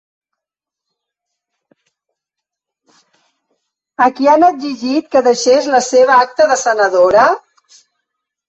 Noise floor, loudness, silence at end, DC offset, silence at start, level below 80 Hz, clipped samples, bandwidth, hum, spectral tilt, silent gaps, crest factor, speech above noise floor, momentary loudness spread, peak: -84 dBFS; -12 LUFS; 1.1 s; under 0.1%; 4 s; -58 dBFS; under 0.1%; 8.2 kHz; none; -2.5 dB/octave; none; 14 dB; 73 dB; 8 LU; -2 dBFS